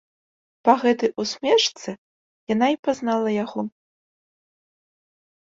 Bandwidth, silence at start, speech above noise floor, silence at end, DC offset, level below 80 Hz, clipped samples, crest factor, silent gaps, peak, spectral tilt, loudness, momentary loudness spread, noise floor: 7.8 kHz; 0.65 s; over 69 dB; 1.9 s; under 0.1%; -70 dBFS; under 0.1%; 22 dB; 1.98-2.47 s, 2.79-2.83 s; -2 dBFS; -4 dB/octave; -22 LUFS; 15 LU; under -90 dBFS